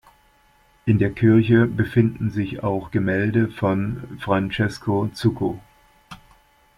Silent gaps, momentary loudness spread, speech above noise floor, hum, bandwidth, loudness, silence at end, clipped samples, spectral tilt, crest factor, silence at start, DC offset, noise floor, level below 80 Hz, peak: none; 10 LU; 37 dB; none; 12 kHz; -21 LUFS; 0.6 s; under 0.1%; -8.5 dB/octave; 18 dB; 0.85 s; under 0.1%; -58 dBFS; -48 dBFS; -4 dBFS